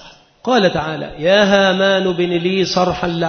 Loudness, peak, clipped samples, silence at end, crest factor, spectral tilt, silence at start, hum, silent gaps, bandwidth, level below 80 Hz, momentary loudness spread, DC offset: -15 LUFS; 0 dBFS; under 0.1%; 0 s; 16 dB; -5 dB/octave; 0 s; none; none; 6.6 kHz; -44 dBFS; 9 LU; under 0.1%